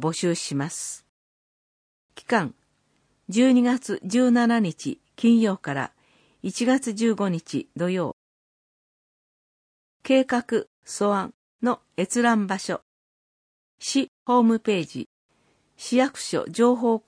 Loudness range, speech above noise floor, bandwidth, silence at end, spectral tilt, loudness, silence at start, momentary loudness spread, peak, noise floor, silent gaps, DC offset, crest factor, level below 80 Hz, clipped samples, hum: 6 LU; 45 dB; 10.5 kHz; 0.1 s; -5 dB/octave; -24 LUFS; 0 s; 14 LU; -6 dBFS; -68 dBFS; 1.09-2.09 s, 8.13-10.00 s, 10.67-10.82 s, 11.34-11.59 s, 12.82-13.78 s, 14.08-14.26 s, 15.06-15.29 s; under 0.1%; 18 dB; -72 dBFS; under 0.1%; none